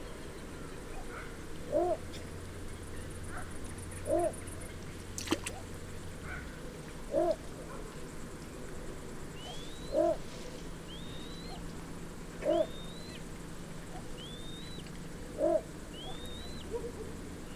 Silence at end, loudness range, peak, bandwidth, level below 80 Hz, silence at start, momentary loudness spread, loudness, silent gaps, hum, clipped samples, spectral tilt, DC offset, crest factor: 0 s; 2 LU; -16 dBFS; 16 kHz; -50 dBFS; 0 s; 13 LU; -39 LUFS; none; none; under 0.1%; -5 dB/octave; under 0.1%; 22 dB